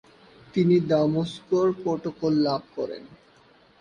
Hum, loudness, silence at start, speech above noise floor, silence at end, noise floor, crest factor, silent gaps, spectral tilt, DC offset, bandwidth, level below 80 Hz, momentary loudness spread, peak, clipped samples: none; -25 LUFS; 0.55 s; 33 dB; 0.65 s; -57 dBFS; 16 dB; none; -8 dB/octave; under 0.1%; 9.8 kHz; -62 dBFS; 12 LU; -10 dBFS; under 0.1%